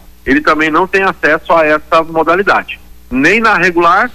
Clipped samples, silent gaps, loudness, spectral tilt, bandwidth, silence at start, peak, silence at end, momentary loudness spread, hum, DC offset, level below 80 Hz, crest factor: under 0.1%; none; -10 LUFS; -5 dB/octave; 15.5 kHz; 0.25 s; 0 dBFS; 0 s; 6 LU; none; under 0.1%; -38 dBFS; 10 dB